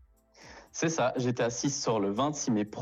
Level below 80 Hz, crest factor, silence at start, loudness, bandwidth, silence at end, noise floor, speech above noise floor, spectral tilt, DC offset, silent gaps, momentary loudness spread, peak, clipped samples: -64 dBFS; 14 dB; 0.4 s; -30 LUFS; 8.6 kHz; 0 s; -56 dBFS; 27 dB; -4.5 dB/octave; under 0.1%; none; 3 LU; -18 dBFS; under 0.1%